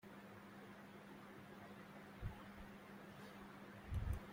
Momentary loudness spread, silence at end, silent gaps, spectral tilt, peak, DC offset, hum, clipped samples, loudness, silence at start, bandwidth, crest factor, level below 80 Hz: 10 LU; 0 s; none; -6.5 dB/octave; -32 dBFS; under 0.1%; none; under 0.1%; -55 LUFS; 0.05 s; 16.5 kHz; 20 dB; -58 dBFS